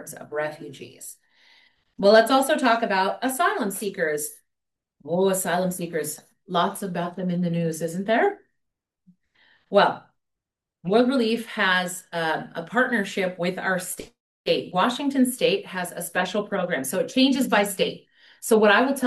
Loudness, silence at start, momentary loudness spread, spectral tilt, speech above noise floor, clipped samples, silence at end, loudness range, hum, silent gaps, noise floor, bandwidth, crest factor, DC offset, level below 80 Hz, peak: -23 LUFS; 0 s; 13 LU; -4 dB/octave; 63 dB; under 0.1%; 0 s; 5 LU; none; 14.20-14.44 s; -86 dBFS; 12.5 kHz; 20 dB; under 0.1%; -70 dBFS; -4 dBFS